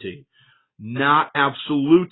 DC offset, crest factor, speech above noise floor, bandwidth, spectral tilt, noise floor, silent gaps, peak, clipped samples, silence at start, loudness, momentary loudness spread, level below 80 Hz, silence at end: under 0.1%; 18 dB; 40 dB; 4.1 kHz; -10.5 dB/octave; -59 dBFS; none; -4 dBFS; under 0.1%; 0 s; -19 LUFS; 17 LU; -62 dBFS; 0.05 s